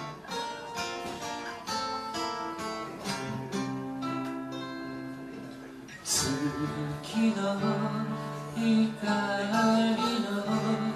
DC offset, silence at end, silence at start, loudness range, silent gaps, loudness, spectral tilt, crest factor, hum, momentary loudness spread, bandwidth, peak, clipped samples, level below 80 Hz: under 0.1%; 0 s; 0 s; 7 LU; none; -31 LUFS; -4.5 dB/octave; 16 dB; none; 12 LU; 13.5 kHz; -14 dBFS; under 0.1%; -62 dBFS